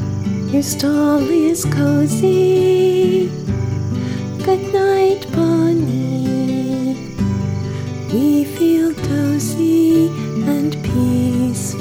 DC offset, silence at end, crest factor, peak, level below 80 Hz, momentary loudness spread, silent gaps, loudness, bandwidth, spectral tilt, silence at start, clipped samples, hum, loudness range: under 0.1%; 0 s; 12 dB; -4 dBFS; -42 dBFS; 8 LU; none; -16 LUFS; 19.5 kHz; -6.5 dB/octave; 0 s; under 0.1%; none; 3 LU